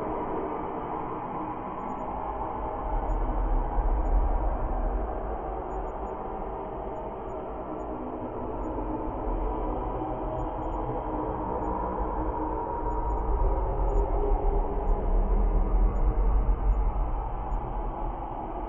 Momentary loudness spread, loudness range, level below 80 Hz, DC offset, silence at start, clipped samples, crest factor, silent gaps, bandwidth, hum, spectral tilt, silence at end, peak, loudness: 7 LU; 6 LU; -30 dBFS; under 0.1%; 0 s; under 0.1%; 14 dB; none; 3.3 kHz; none; -10.5 dB/octave; 0 s; -14 dBFS; -32 LUFS